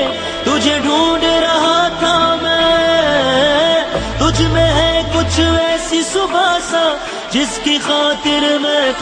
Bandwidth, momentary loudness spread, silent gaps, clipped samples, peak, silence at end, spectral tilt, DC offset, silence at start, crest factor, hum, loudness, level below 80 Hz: 10 kHz; 4 LU; none; under 0.1%; 0 dBFS; 0 s; -4 dB/octave; under 0.1%; 0 s; 14 dB; none; -13 LUFS; -30 dBFS